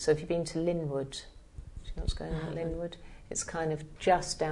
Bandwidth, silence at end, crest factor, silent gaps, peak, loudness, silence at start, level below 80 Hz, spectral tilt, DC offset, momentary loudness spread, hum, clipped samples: 11 kHz; 0 s; 20 dB; none; -12 dBFS; -33 LUFS; 0 s; -44 dBFS; -4.5 dB/octave; under 0.1%; 20 LU; none; under 0.1%